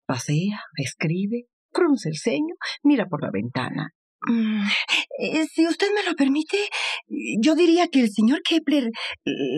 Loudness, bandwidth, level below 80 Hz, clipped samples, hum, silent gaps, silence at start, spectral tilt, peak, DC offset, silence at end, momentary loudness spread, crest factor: -23 LUFS; 12.5 kHz; -74 dBFS; under 0.1%; none; 1.53-1.69 s, 3.95-4.19 s; 0.1 s; -5 dB/octave; -8 dBFS; under 0.1%; 0 s; 9 LU; 14 dB